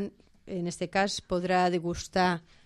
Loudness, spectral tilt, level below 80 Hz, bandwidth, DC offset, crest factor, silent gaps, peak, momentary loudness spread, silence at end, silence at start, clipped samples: -29 LUFS; -5 dB/octave; -54 dBFS; 12 kHz; under 0.1%; 16 dB; none; -14 dBFS; 10 LU; 0.25 s; 0 s; under 0.1%